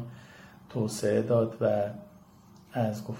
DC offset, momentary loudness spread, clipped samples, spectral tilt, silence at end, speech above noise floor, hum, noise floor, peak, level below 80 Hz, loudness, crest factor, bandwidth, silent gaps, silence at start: under 0.1%; 20 LU; under 0.1%; -6.5 dB/octave; 0 s; 27 dB; none; -55 dBFS; -14 dBFS; -66 dBFS; -29 LUFS; 18 dB; 16.5 kHz; none; 0 s